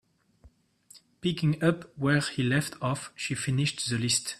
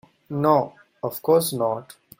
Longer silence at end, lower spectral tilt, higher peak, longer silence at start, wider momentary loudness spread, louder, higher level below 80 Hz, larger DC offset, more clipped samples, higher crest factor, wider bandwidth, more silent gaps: second, 0 s vs 0.25 s; about the same, -4.5 dB/octave vs -5.5 dB/octave; second, -10 dBFS vs -4 dBFS; first, 0.45 s vs 0.3 s; second, 6 LU vs 13 LU; second, -28 LUFS vs -23 LUFS; about the same, -62 dBFS vs -66 dBFS; neither; neither; about the same, 20 dB vs 18 dB; second, 13.5 kHz vs 16.5 kHz; neither